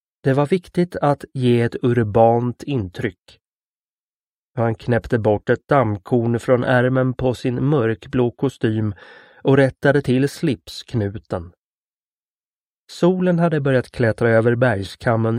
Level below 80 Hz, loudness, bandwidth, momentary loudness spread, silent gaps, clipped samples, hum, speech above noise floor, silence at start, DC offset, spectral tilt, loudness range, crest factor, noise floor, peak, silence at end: -48 dBFS; -19 LUFS; 12 kHz; 9 LU; 3.21-3.25 s, 3.47-4.54 s, 11.58-12.87 s; under 0.1%; none; over 72 dB; 0.25 s; under 0.1%; -8 dB/octave; 4 LU; 18 dB; under -90 dBFS; 0 dBFS; 0 s